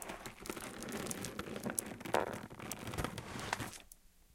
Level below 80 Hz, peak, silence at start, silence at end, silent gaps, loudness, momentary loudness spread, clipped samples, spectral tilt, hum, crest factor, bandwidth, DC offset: -60 dBFS; -10 dBFS; 0 s; 0 s; none; -42 LUFS; 9 LU; under 0.1%; -3.5 dB/octave; none; 32 dB; 17 kHz; under 0.1%